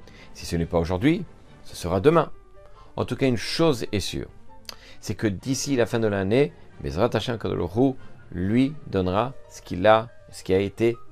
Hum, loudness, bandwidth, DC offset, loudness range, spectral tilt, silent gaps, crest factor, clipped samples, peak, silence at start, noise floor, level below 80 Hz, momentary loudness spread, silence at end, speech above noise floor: none; -24 LUFS; 15 kHz; under 0.1%; 2 LU; -6 dB/octave; none; 22 dB; under 0.1%; -4 dBFS; 0 s; -45 dBFS; -48 dBFS; 19 LU; 0 s; 22 dB